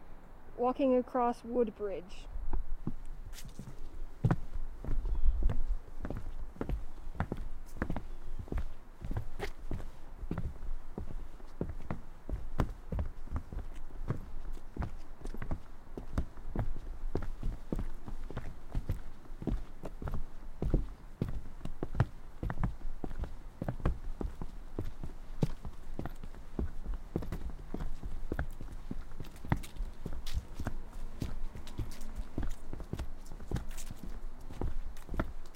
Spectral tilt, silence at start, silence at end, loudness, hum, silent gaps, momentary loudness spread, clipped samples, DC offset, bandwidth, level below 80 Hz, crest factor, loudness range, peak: -7.5 dB/octave; 0 s; 0 s; -41 LUFS; none; none; 14 LU; under 0.1%; under 0.1%; 9.4 kHz; -38 dBFS; 22 dB; 5 LU; -12 dBFS